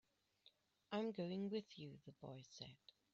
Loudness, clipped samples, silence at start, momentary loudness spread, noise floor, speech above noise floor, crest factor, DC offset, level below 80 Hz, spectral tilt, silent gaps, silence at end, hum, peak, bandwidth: -50 LUFS; under 0.1%; 0.45 s; 13 LU; -76 dBFS; 27 dB; 18 dB; under 0.1%; -88 dBFS; -5.5 dB/octave; none; 0.4 s; none; -34 dBFS; 7.6 kHz